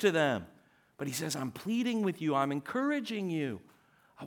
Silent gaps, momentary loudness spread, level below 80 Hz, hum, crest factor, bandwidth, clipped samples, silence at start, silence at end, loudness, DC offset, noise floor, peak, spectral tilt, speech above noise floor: none; 8 LU; -76 dBFS; none; 18 dB; 19.5 kHz; under 0.1%; 0 s; 0 s; -33 LUFS; under 0.1%; -57 dBFS; -14 dBFS; -5 dB/octave; 25 dB